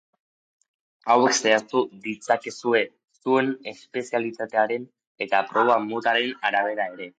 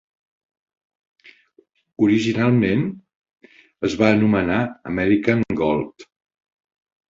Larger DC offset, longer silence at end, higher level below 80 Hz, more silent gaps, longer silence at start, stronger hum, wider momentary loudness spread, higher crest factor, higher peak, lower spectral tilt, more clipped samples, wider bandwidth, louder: neither; second, 0.1 s vs 1.05 s; second, -78 dBFS vs -50 dBFS; about the same, 5.07-5.15 s vs 3.15-3.22 s; second, 1.05 s vs 2 s; neither; first, 13 LU vs 9 LU; about the same, 18 dB vs 20 dB; second, -6 dBFS vs -2 dBFS; second, -3 dB/octave vs -7 dB/octave; neither; first, 9.4 kHz vs 7.6 kHz; second, -23 LUFS vs -20 LUFS